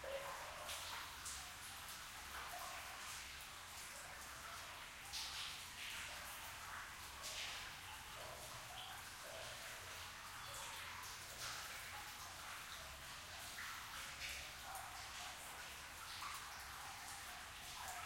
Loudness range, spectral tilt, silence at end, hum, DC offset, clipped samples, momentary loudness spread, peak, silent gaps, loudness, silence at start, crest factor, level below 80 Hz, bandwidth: 2 LU; -0.5 dB/octave; 0 s; none; under 0.1%; under 0.1%; 4 LU; -34 dBFS; none; -50 LUFS; 0 s; 18 dB; -68 dBFS; 16.5 kHz